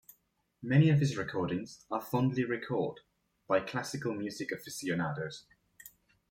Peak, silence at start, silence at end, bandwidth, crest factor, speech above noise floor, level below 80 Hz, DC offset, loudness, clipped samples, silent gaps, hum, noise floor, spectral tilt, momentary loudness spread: -14 dBFS; 0.6 s; 0.45 s; 16.5 kHz; 20 dB; 42 dB; -68 dBFS; under 0.1%; -33 LUFS; under 0.1%; none; none; -74 dBFS; -6.5 dB/octave; 19 LU